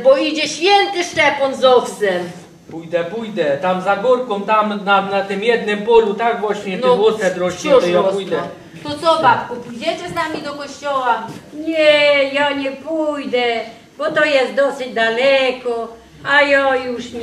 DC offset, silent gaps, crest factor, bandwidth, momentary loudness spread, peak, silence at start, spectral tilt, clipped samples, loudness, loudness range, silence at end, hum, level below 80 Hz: under 0.1%; none; 16 dB; 13 kHz; 12 LU; -2 dBFS; 0 s; -4 dB/octave; under 0.1%; -16 LUFS; 2 LU; 0 s; none; -56 dBFS